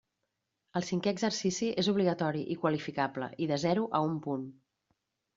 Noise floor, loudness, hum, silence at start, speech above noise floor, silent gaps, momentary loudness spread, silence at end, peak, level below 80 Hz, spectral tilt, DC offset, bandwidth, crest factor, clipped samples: -84 dBFS; -32 LUFS; none; 0.75 s; 53 dB; none; 8 LU; 0.85 s; -14 dBFS; -72 dBFS; -5 dB/octave; under 0.1%; 7.8 kHz; 18 dB; under 0.1%